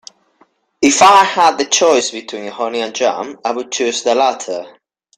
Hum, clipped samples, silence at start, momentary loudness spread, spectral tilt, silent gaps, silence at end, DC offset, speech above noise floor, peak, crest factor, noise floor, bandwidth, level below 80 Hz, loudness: none; under 0.1%; 0.8 s; 16 LU; -1.5 dB/octave; none; 0.45 s; under 0.1%; 41 dB; 0 dBFS; 16 dB; -55 dBFS; 15.5 kHz; -60 dBFS; -14 LUFS